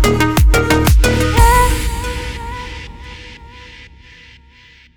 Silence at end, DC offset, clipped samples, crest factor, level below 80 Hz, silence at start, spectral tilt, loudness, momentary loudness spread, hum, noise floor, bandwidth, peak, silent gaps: 1.1 s; under 0.1%; under 0.1%; 14 dB; -18 dBFS; 0 s; -5 dB/octave; -14 LUFS; 23 LU; none; -45 dBFS; over 20 kHz; 0 dBFS; none